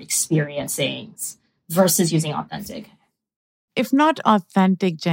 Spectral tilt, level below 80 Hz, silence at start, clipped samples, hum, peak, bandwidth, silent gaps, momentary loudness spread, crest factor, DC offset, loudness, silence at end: -4.5 dB/octave; -64 dBFS; 0 s; under 0.1%; none; -2 dBFS; 16.5 kHz; 3.36-3.68 s; 14 LU; 20 dB; under 0.1%; -20 LUFS; 0 s